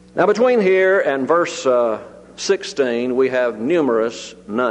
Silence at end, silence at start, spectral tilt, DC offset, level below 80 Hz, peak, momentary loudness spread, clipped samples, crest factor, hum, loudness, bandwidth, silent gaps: 0 s; 0.15 s; -4.5 dB/octave; under 0.1%; -60 dBFS; -4 dBFS; 10 LU; under 0.1%; 14 dB; none; -17 LUFS; 9.6 kHz; none